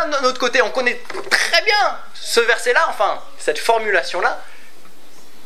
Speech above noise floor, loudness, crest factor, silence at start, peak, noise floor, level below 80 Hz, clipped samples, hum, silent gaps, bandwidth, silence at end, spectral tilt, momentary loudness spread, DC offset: 29 dB; -17 LUFS; 20 dB; 0 s; 0 dBFS; -47 dBFS; -70 dBFS; under 0.1%; none; none; 16 kHz; 0.95 s; -0.5 dB/octave; 9 LU; 5%